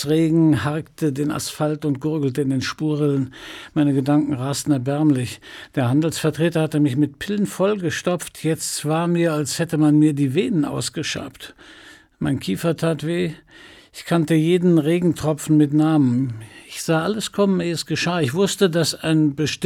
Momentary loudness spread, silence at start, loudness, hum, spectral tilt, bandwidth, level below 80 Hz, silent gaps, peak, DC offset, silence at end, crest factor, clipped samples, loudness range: 10 LU; 0 s; -20 LUFS; none; -6 dB/octave; 16.5 kHz; -56 dBFS; none; -6 dBFS; under 0.1%; 0 s; 14 dB; under 0.1%; 4 LU